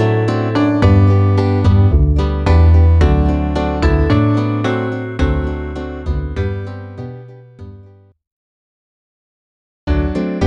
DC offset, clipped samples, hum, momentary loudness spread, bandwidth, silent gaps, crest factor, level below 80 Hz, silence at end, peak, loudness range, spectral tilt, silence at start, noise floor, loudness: under 0.1%; under 0.1%; none; 14 LU; 7.4 kHz; 8.27-9.87 s; 14 dB; -20 dBFS; 0 s; -2 dBFS; 16 LU; -8.5 dB/octave; 0 s; -43 dBFS; -15 LUFS